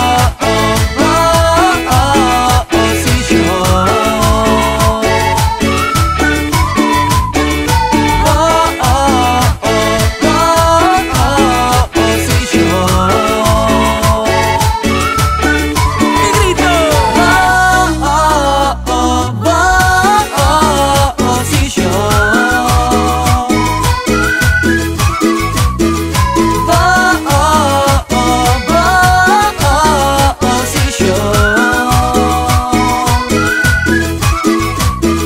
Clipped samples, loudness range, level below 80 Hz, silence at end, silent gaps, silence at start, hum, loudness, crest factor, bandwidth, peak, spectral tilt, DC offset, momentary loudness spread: under 0.1%; 2 LU; -20 dBFS; 0 s; none; 0 s; none; -10 LUFS; 10 dB; 16.5 kHz; 0 dBFS; -4.5 dB/octave; under 0.1%; 4 LU